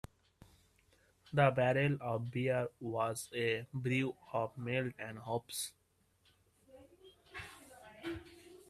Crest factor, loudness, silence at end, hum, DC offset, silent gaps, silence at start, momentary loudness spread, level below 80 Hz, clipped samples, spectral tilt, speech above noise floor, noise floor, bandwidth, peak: 24 dB; -37 LUFS; 0.15 s; none; under 0.1%; none; 1.3 s; 18 LU; -70 dBFS; under 0.1%; -5.5 dB/octave; 37 dB; -73 dBFS; 15.5 kHz; -14 dBFS